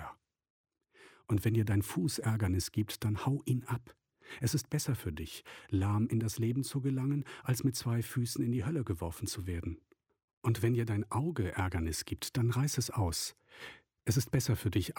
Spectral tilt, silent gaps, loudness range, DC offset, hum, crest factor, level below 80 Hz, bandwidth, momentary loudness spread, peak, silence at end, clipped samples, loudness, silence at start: -5.5 dB/octave; 0.50-0.64 s, 10.24-10.42 s; 2 LU; under 0.1%; none; 16 dB; -54 dBFS; 17.5 kHz; 9 LU; -18 dBFS; 0.05 s; under 0.1%; -34 LUFS; 0 s